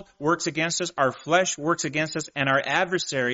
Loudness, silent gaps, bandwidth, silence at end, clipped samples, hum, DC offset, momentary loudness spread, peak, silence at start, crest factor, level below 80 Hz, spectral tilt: -24 LUFS; none; 8 kHz; 0 s; under 0.1%; none; under 0.1%; 4 LU; -6 dBFS; 0 s; 18 dB; -64 dBFS; -2.5 dB/octave